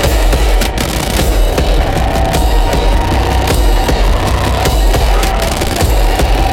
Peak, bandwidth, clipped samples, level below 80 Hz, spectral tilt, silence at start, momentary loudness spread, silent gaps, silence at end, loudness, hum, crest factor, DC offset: 0 dBFS; 17 kHz; under 0.1%; -12 dBFS; -4.5 dB/octave; 0 s; 2 LU; none; 0 s; -13 LUFS; none; 10 dB; under 0.1%